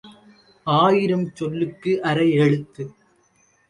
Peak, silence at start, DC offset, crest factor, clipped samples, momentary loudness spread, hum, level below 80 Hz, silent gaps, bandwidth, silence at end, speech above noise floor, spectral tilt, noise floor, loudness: -4 dBFS; 0.05 s; under 0.1%; 16 dB; under 0.1%; 17 LU; none; -60 dBFS; none; 11 kHz; 0.8 s; 41 dB; -7.5 dB/octave; -61 dBFS; -20 LUFS